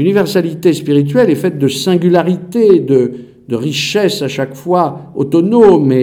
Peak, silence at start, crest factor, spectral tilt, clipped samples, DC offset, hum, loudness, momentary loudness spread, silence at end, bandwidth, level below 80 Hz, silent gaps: 0 dBFS; 0 s; 12 dB; -6.5 dB/octave; under 0.1%; under 0.1%; none; -12 LUFS; 11 LU; 0 s; 18 kHz; -52 dBFS; none